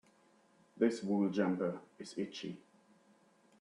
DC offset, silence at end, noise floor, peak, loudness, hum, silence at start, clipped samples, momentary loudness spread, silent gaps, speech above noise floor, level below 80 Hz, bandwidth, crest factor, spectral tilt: under 0.1%; 1 s; -69 dBFS; -18 dBFS; -37 LUFS; none; 0.75 s; under 0.1%; 15 LU; none; 33 dB; -82 dBFS; 10.5 kHz; 22 dB; -6.5 dB/octave